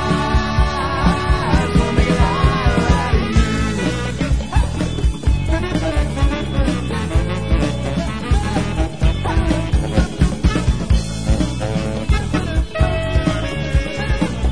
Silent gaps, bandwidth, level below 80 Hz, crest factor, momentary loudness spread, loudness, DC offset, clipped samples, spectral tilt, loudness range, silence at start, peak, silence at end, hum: none; 10.5 kHz; -20 dBFS; 16 dB; 5 LU; -19 LUFS; 2%; under 0.1%; -6 dB/octave; 3 LU; 0 s; -2 dBFS; 0 s; none